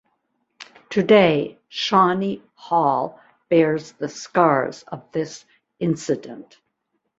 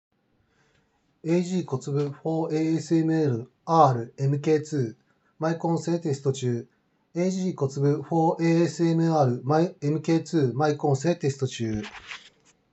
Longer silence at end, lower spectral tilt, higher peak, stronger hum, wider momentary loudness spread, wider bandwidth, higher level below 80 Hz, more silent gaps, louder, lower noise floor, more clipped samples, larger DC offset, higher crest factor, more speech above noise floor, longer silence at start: first, 0.8 s vs 0.55 s; second, -5.5 dB/octave vs -7 dB/octave; about the same, -2 dBFS vs -4 dBFS; neither; first, 16 LU vs 9 LU; about the same, 8 kHz vs 8.2 kHz; about the same, -64 dBFS vs -66 dBFS; neither; first, -20 LUFS vs -25 LUFS; first, -74 dBFS vs -68 dBFS; neither; neither; about the same, 20 dB vs 20 dB; first, 54 dB vs 43 dB; second, 0.6 s vs 1.25 s